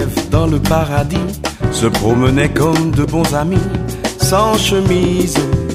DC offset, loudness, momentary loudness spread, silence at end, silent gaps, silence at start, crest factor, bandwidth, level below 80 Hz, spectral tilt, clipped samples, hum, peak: under 0.1%; -14 LUFS; 6 LU; 0 s; none; 0 s; 14 dB; 15.5 kHz; -26 dBFS; -5.5 dB/octave; under 0.1%; none; 0 dBFS